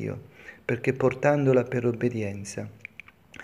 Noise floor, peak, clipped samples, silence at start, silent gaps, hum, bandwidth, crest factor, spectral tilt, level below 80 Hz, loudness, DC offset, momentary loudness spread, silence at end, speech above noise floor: -50 dBFS; -6 dBFS; under 0.1%; 0 s; none; none; 11.5 kHz; 20 dB; -7 dB/octave; -62 dBFS; -26 LUFS; under 0.1%; 19 LU; 0 s; 24 dB